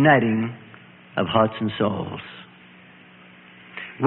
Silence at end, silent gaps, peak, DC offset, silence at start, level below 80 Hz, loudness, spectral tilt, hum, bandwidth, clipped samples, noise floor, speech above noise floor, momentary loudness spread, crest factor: 0 s; none; -2 dBFS; under 0.1%; 0 s; -60 dBFS; -23 LUFS; -11 dB/octave; none; 4.2 kHz; under 0.1%; -48 dBFS; 27 dB; 22 LU; 22 dB